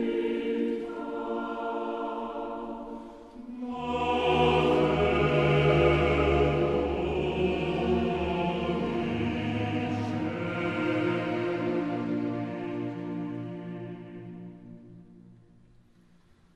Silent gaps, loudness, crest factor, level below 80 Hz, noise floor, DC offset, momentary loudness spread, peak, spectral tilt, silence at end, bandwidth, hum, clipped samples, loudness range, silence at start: none; -28 LUFS; 18 dB; -44 dBFS; -60 dBFS; under 0.1%; 17 LU; -10 dBFS; -7.5 dB/octave; 1.2 s; 9.4 kHz; none; under 0.1%; 12 LU; 0 s